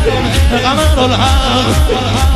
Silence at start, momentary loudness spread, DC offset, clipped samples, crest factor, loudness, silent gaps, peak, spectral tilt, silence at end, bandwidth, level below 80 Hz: 0 s; 2 LU; under 0.1%; under 0.1%; 10 dB; -11 LUFS; none; 0 dBFS; -5 dB/octave; 0 s; 13.5 kHz; -16 dBFS